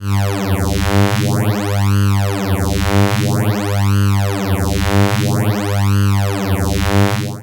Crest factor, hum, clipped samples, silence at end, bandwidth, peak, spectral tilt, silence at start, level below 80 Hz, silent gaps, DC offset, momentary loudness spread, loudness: 14 dB; none; under 0.1%; 0 s; 17.5 kHz; 0 dBFS; -6 dB/octave; 0 s; -30 dBFS; none; under 0.1%; 3 LU; -16 LUFS